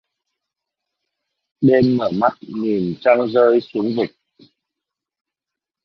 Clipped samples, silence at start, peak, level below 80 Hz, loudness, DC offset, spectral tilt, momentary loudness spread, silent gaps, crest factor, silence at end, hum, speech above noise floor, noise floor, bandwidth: under 0.1%; 1.6 s; -2 dBFS; -58 dBFS; -18 LUFS; under 0.1%; -9 dB/octave; 8 LU; none; 18 dB; 1.75 s; none; 70 dB; -86 dBFS; 6 kHz